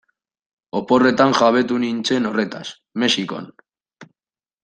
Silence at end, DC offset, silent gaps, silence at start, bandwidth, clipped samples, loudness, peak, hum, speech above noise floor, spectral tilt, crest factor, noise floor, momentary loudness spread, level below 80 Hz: 0.6 s; under 0.1%; none; 0.75 s; 9.4 kHz; under 0.1%; -18 LUFS; -2 dBFS; none; over 72 dB; -4.5 dB/octave; 18 dB; under -90 dBFS; 15 LU; -62 dBFS